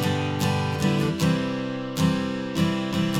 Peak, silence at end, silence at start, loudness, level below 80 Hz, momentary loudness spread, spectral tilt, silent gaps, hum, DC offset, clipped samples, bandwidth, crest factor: -8 dBFS; 0 s; 0 s; -25 LUFS; -52 dBFS; 5 LU; -6 dB/octave; none; none; under 0.1%; under 0.1%; 17 kHz; 14 dB